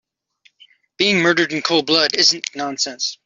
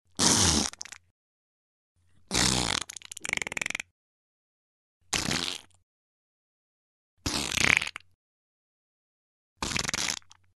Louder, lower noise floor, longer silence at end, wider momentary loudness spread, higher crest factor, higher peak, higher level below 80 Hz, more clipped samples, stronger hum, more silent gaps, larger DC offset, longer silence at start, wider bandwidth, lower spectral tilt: first, -16 LUFS vs -27 LUFS; second, -58 dBFS vs under -90 dBFS; second, 0.1 s vs 0.4 s; second, 8 LU vs 15 LU; second, 18 dB vs 30 dB; first, 0 dBFS vs -4 dBFS; second, -64 dBFS vs -50 dBFS; neither; neither; second, none vs 1.11-1.95 s, 3.91-5.00 s, 5.83-7.17 s, 8.15-9.56 s; neither; first, 1 s vs 0.2 s; second, 7.8 kHz vs 12.5 kHz; about the same, -2.5 dB/octave vs -1.5 dB/octave